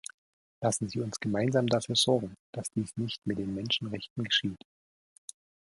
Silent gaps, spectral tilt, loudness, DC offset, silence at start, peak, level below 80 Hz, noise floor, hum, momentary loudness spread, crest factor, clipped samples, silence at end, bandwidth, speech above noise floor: 2.39-2.53 s, 4.10-4.16 s; -4 dB/octave; -30 LUFS; under 0.1%; 0.6 s; -12 dBFS; -62 dBFS; under -90 dBFS; none; 20 LU; 20 dB; under 0.1%; 1.2 s; 11.5 kHz; over 59 dB